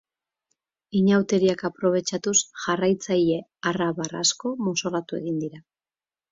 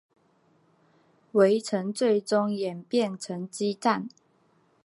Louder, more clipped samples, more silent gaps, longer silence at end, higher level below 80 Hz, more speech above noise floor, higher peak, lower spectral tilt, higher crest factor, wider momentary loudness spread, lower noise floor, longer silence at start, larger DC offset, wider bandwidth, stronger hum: first, -24 LUFS vs -27 LUFS; neither; neither; about the same, 0.7 s vs 0.75 s; first, -66 dBFS vs -82 dBFS; first, over 66 dB vs 40 dB; about the same, -8 dBFS vs -8 dBFS; second, -4 dB/octave vs -5.5 dB/octave; about the same, 18 dB vs 20 dB; about the same, 8 LU vs 10 LU; first, under -90 dBFS vs -65 dBFS; second, 0.95 s vs 1.35 s; neither; second, 7.8 kHz vs 11.5 kHz; neither